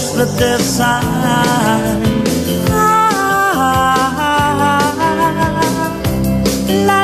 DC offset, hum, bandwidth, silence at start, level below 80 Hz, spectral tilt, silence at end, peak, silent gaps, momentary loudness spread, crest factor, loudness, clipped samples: under 0.1%; none; 15.5 kHz; 0 s; -32 dBFS; -4.5 dB/octave; 0 s; -2 dBFS; none; 4 LU; 10 dB; -13 LUFS; under 0.1%